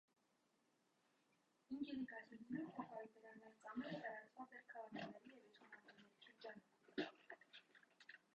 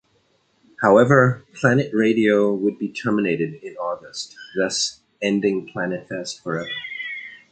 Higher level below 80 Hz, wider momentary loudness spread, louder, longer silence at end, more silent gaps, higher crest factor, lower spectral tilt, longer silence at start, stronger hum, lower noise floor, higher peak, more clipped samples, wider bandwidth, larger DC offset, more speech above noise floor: second, under -90 dBFS vs -62 dBFS; about the same, 15 LU vs 14 LU; second, -54 LUFS vs -21 LUFS; about the same, 0.2 s vs 0.15 s; neither; about the same, 24 dB vs 20 dB; about the same, -6 dB/octave vs -5.5 dB/octave; first, 1.7 s vs 0.8 s; neither; first, -84 dBFS vs -63 dBFS; second, -32 dBFS vs -2 dBFS; neither; second, 8.2 kHz vs 9.2 kHz; neither; second, 33 dB vs 43 dB